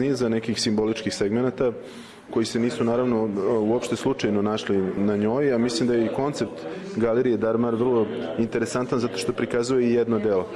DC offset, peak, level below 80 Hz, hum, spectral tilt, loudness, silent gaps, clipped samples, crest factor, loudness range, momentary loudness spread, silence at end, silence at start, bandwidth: under 0.1%; -12 dBFS; -54 dBFS; none; -5.5 dB/octave; -24 LUFS; none; under 0.1%; 12 dB; 1 LU; 5 LU; 0 s; 0 s; 12.5 kHz